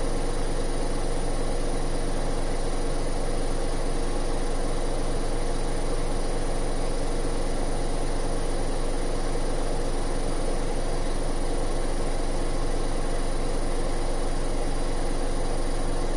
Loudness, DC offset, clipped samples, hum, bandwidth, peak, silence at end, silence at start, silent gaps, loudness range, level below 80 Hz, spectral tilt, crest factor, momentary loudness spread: -31 LUFS; under 0.1%; under 0.1%; none; 11.5 kHz; -14 dBFS; 0 s; 0 s; none; 0 LU; -26 dBFS; -5 dB/octave; 10 dB; 0 LU